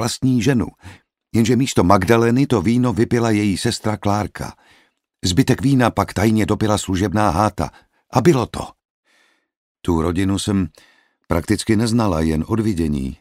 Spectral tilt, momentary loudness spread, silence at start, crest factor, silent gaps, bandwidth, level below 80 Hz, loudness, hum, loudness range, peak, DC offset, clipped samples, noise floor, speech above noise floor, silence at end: -6 dB/octave; 9 LU; 0 s; 18 dB; 8.85-9.03 s, 9.57-9.75 s; 16 kHz; -38 dBFS; -18 LUFS; none; 4 LU; 0 dBFS; under 0.1%; under 0.1%; -60 dBFS; 43 dB; 0.05 s